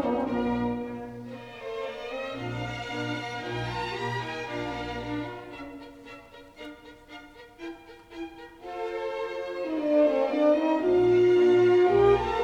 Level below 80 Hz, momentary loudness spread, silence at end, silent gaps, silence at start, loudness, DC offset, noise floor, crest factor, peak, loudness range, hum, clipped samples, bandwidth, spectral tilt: -52 dBFS; 24 LU; 0 s; none; 0 s; -26 LUFS; under 0.1%; -47 dBFS; 16 dB; -10 dBFS; 18 LU; none; under 0.1%; 8.2 kHz; -7 dB/octave